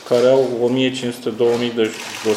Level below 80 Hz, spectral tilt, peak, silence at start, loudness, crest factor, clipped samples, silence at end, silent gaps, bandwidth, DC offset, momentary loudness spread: -64 dBFS; -5 dB/octave; -2 dBFS; 0 s; -18 LUFS; 14 dB; under 0.1%; 0 s; none; 15.5 kHz; under 0.1%; 9 LU